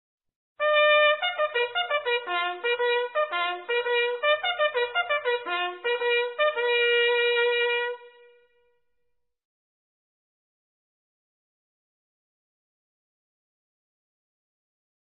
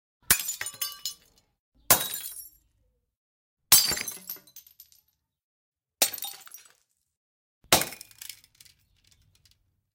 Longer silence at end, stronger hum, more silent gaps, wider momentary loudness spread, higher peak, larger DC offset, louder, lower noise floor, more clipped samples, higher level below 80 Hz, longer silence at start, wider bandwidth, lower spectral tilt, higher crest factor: first, 6.95 s vs 1.6 s; neither; second, none vs 1.59-1.72 s, 3.17-3.57 s, 5.43-5.72 s, 7.17-7.61 s; second, 7 LU vs 24 LU; second, -8 dBFS vs 0 dBFS; neither; about the same, -24 LUFS vs -24 LUFS; first, -80 dBFS vs -72 dBFS; neither; second, -84 dBFS vs -58 dBFS; first, 0.6 s vs 0.3 s; second, 4.1 kHz vs 17 kHz; second, 4.5 dB/octave vs 0 dB/octave; second, 18 dB vs 30 dB